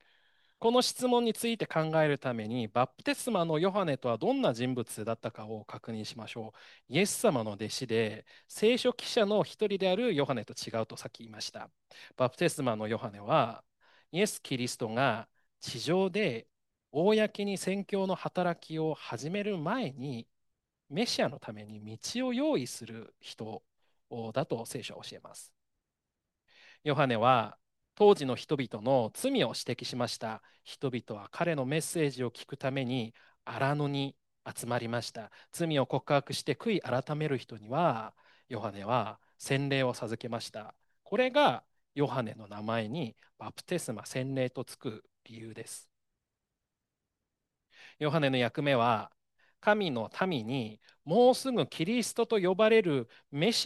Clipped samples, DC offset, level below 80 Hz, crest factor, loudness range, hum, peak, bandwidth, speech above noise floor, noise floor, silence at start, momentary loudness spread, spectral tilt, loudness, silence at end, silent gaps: under 0.1%; under 0.1%; -76 dBFS; 22 dB; 7 LU; none; -10 dBFS; 12.5 kHz; 56 dB; -88 dBFS; 0.6 s; 17 LU; -5 dB/octave; -31 LUFS; 0 s; none